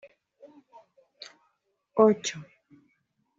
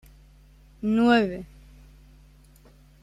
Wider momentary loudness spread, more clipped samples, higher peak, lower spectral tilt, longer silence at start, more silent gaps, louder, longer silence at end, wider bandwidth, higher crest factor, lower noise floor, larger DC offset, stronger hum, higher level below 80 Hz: first, 25 LU vs 20 LU; neither; about the same, -6 dBFS vs -8 dBFS; second, -4.5 dB/octave vs -6.5 dB/octave; first, 1.95 s vs 0.8 s; neither; about the same, -25 LUFS vs -23 LUFS; second, 0.95 s vs 1.55 s; second, 7.8 kHz vs 10 kHz; about the same, 24 dB vs 20 dB; first, -75 dBFS vs -54 dBFS; neither; neither; second, -78 dBFS vs -52 dBFS